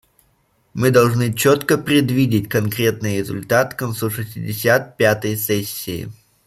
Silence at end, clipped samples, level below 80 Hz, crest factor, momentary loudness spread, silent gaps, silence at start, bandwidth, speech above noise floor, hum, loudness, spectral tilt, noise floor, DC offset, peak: 0.35 s; under 0.1%; -52 dBFS; 16 dB; 11 LU; none; 0.75 s; 15.5 kHz; 43 dB; none; -18 LUFS; -5.5 dB/octave; -61 dBFS; under 0.1%; -2 dBFS